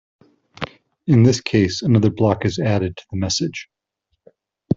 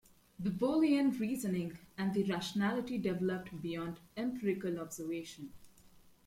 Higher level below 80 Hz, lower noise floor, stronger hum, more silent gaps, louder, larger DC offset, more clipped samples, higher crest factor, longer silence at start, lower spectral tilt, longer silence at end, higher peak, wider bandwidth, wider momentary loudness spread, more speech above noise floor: first, -52 dBFS vs -68 dBFS; first, -73 dBFS vs -61 dBFS; neither; neither; first, -18 LUFS vs -36 LUFS; neither; neither; about the same, 18 dB vs 16 dB; first, 0.6 s vs 0.4 s; about the same, -6 dB/octave vs -6 dB/octave; second, 0 s vs 0.4 s; first, -2 dBFS vs -20 dBFS; second, 7.8 kHz vs 16.5 kHz; first, 17 LU vs 12 LU; first, 56 dB vs 26 dB